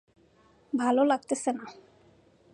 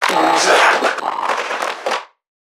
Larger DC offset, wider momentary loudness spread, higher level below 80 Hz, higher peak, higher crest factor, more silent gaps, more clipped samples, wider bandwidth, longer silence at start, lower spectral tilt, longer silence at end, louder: neither; about the same, 13 LU vs 11 LU; about the same, -76 dBFS vs -74 dBFS; second, -12 dBFS vs 0 dBFS; about the same, 18 dB vs 16 dB; neither; neither; second, 11.5 kHz vs 18.5 kHz; first, 0.75 s vs 0 s; first, -3.5 dB/octave vs -1 dB/octave; first, 0.8 s vs 0.4 s; second, -28 LUFS vs -15 LUFS